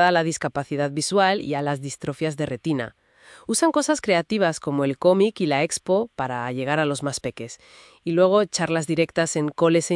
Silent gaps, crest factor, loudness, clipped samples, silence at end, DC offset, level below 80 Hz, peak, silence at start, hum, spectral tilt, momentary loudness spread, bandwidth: none; 18 dB; -23 LUFS; under 0.1%; 0 s; under 0.1%; -62 dBFS; -4 dBFS; 0 s; none; -4.5 dB/octave; 10 LU; 12 kHz